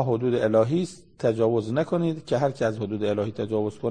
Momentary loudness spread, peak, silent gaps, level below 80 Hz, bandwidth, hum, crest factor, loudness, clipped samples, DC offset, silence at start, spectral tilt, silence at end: 6 LU; -8 dBFS; none; -60 dBFS; 9.8 kHz; none; 16 dB; -25 LUFS; under 0.1%; 0.2%; 0 s; -7.5 dB/octave; 0 s